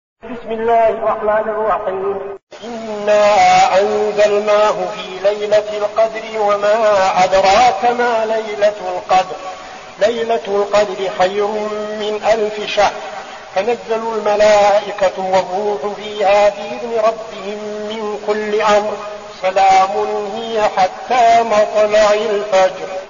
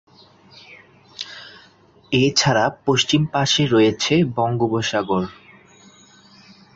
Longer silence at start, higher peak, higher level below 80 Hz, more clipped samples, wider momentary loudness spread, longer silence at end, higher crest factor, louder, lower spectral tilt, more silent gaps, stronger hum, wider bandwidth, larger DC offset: second, 0.25 s vs 0.7 s; about the same, -2 dBFS vs -4 dBFS; about the same, -50 dBFS vs -54 dBFS; neither; second, 13 LU vs 17 LU; second, 0 s vs 1.45 s; about the same, 14 dB vs 18 dB; first, -15 LUFS vs -18 LUFS; second, -1.5 dB/octave vs -4.5 dB/octave; first, 2.43-2.47 s vs none; neither; about the same, 7.4 kHz vs 8 kHz; neither